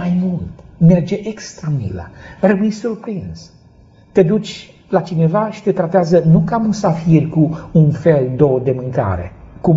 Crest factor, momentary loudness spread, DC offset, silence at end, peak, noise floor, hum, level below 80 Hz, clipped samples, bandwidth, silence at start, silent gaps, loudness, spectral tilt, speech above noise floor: 16 dB; 15 LU; under 0.1%; 0 s; 0 dBFS; -46 dBFS; none; -42 dBFS; under 0.1%; 7.6 kHz; 0 s; none; -15 LUFS; -8.5 dB/octave; 31 dB